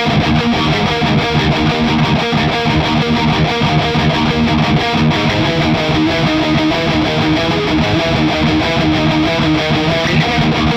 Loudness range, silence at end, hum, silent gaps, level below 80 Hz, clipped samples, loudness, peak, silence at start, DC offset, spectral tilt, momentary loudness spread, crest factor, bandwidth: 0 LU; 0 s; none; none; -30 dBFS; under 0.1%; -13 LUFS; -2 dBFS; 0 s; under 0.1%; -6 dB/octave; 1 LU; 10 dB; 9.8 kHz